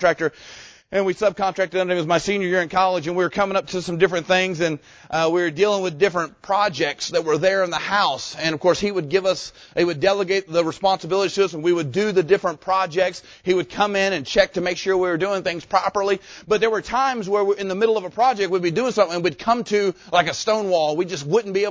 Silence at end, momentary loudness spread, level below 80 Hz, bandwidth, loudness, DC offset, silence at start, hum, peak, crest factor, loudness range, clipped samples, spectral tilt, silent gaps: 0 s; 5 LU; -54 dBFS; 8 kHz; -21 LUFS; under 0.1%; 0 s; none; -2 dBFS; 18 dB; 1 LU; under 0.1%; -4.5 dB/octave; none